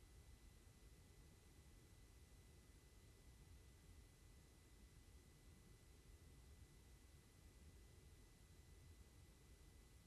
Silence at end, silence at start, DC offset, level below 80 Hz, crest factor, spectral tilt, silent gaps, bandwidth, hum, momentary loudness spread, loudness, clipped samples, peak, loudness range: 0 s; 0 s; under 0.1%; -68 dBFS; 14 dB; -4.5 dB/octave; none; 13.5 kHz; none; 2 LU; -68 LUFS; under 0.1%; -52 dBFS; 1 LU